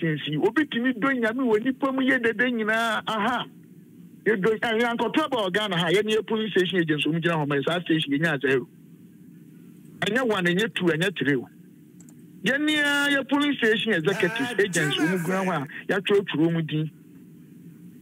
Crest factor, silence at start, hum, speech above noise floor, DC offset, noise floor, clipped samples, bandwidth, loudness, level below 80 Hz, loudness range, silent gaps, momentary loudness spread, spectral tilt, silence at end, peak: 16 dB; 0 s; none; 25 dB; under 0.1%; -49 dBFS; under 0.1%; 16 kHz; -24 LUFS; -72 dBFS; 3 LU; none; 5 LU; -5 dB/octave; 0 s; -10 dBFS